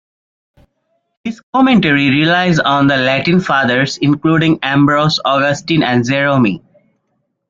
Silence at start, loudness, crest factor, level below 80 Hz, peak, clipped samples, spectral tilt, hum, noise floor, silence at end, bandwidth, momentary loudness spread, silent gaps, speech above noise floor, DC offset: 1.25 s; -12 LUFS; 12 dB; -48 dBFS; 0 dBFS; under 0.1%; -6 dB/octave; none; -67 dBFS; 0.9 s; 7.6 kHz; 4 LU; 1.43-1.53 s; 55 dB; under 0.1%